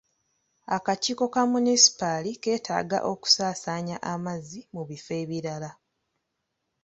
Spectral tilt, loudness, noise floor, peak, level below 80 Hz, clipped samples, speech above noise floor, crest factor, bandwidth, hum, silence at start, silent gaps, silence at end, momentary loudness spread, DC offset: -2.5 dB/octave; -25 LUFS; -80 dBFS; -4 dBFS; -68 dBFS; under 0.1%; 54 dB; 24 dB; 8.2 kHz; none; 0.7 s; none; 1.1 s; 19 LU; under 0.1%